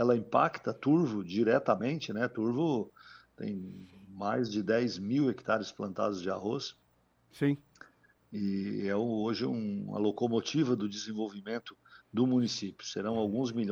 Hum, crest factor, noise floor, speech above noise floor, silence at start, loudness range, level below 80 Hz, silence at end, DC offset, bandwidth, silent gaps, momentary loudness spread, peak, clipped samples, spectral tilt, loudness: none; 20 dB; -70 dBFS; 38 dB; 0 s; 4 LU; -74 dBFS; 0 s; under 0.1%; over 20 kHz; none; 11 LU; -12 dBFS; under 0.1%; -6 dB/octave; -32 LUFS